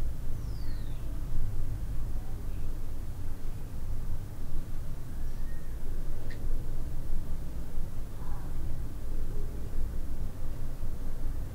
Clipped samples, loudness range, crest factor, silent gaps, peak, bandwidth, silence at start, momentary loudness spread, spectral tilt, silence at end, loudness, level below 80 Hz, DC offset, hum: under 0.1%; 2 LU; 12 dB; none; -16 dBFS; 2.3 kHz; 0 s; 3 LU; -7 dB/octave; 0 s; -40 LUFS; -32 dBFS; under 0.1%; none